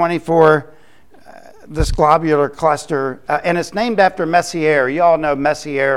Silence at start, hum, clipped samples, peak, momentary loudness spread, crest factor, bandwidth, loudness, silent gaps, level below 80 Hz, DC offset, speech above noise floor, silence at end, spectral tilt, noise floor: 0 s; none; under 0.1%; 0 dBFS; 8 LU; 16 dB; 13 kHz; -15 LUFS; none; -32 dBFS; 0.8%; 34 dB; 0 s; -5.5 dB/octave; -49 dBFS